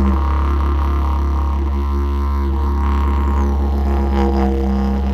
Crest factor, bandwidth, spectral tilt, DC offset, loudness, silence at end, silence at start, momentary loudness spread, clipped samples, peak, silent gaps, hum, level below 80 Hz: 14 dB; 6 kHz; -9 dB/octave; under 0.1%; -18 LUFS; 0 s; 0 s; 3 LU; under 0.1%; -2 dBFS; none; none; -18 dBFS